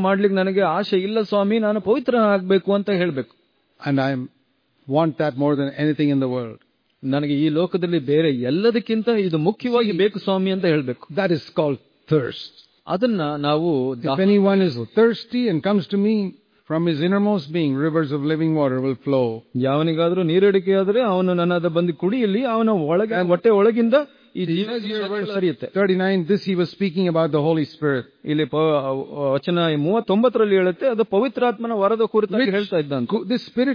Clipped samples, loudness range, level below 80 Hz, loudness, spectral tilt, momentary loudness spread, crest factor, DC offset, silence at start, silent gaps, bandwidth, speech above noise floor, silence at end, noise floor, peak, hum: under 0.1%; 3 LU; -68 dBFS; -20 LUFS; -9 dB/octave; 7 LU; 14 dB; under 0.1%; 0 s; none; 5.2 kHz; 44 dB; 0 s; -64 dBFS; -6 dBFS; none